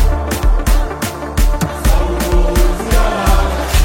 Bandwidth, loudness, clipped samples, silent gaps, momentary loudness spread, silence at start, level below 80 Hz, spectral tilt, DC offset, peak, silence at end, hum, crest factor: 16.5 kHz; -16 LUFS; under 0.1%; none; 4 LU; 0 s; -14 dBFS; -5 dB/octave; under 0.1%; 0 dBFS; 0 s; none; 12 dB